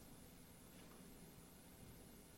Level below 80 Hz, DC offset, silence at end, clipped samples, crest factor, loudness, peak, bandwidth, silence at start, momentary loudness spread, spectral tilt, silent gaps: -70 dBFS; under 0.1%; 0 s; under 0.1%; 14 dB; -61 LUFS; -48 dBFS; 16 kHz; 0 s; 1 LU; -4 dB/octave; none